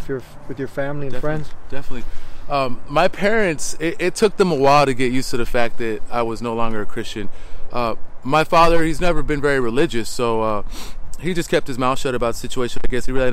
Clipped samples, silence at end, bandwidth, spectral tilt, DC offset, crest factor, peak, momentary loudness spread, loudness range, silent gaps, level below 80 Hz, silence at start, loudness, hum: under 0.1%; 0 s; 13.5 kHz; -5 dB/octave; under 0.1%; 12 dB; -4 dBFS; 17 LU; 5 LU; none; -28 dBFS; 0 s; -20 LUFS; none